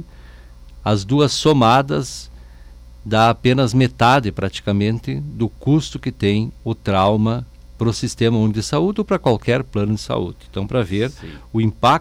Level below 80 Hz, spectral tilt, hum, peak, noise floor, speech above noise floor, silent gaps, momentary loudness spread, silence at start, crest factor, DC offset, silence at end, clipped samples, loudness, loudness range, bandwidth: -40 dBFS; -6 dB/octave; none; -6 dBFS; -40 dBFS; 23 dB; none; 11 LU; 0 s; 12 dB; under 0.1%; 0 s; under 0.1%; -18 LUFS; 3 LU; 14.5 kHz